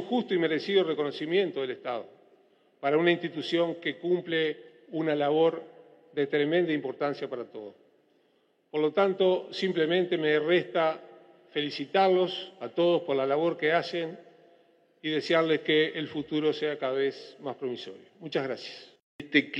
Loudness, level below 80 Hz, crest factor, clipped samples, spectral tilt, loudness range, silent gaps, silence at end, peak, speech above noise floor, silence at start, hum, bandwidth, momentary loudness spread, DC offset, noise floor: -28 LUFS; -82 dBFS; 20 dB; under 0.1%; -6.5 dB/octave; 3 LU; 19.02-19.19 s; 0 s; -8 dBFS; 41 dB; 0 s; none; 8.2 kHz; 14 LU; under 0.1%; -69 dBFS